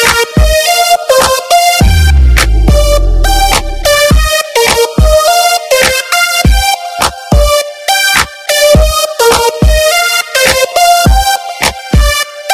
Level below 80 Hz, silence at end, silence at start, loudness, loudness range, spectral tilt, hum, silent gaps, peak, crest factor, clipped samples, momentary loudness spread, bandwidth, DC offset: -12 dBFS; 0 s; 0 s; -8 LUFS; 1 LU; -3 dB/octave; none; none; 0 dBFS; 8 dB; 0.7%; 4 LU; 16 kHz; under 0.1%